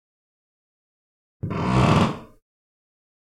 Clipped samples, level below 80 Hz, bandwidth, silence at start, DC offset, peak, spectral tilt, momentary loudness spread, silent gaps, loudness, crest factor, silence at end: under 0.1%; -44 dBFS; 12 kHz; 1.45 s; under 0.1%; -4 dBFS; -7 dB/octave; 18 LU; none; -21 LUFS; 22 dB; 1.15 s